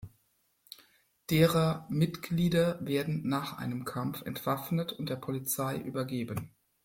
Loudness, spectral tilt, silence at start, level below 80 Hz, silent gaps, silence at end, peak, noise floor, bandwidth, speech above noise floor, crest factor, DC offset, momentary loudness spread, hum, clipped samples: -32 LUFS; -6 dB/octave; 0 s; -62 dBFS; none; 0.35 s; -10 dBFS; -73 dBFS; 17 kHz; 43 dB; 22 dB; under 0.1%; 15 LU; none; under 0.1%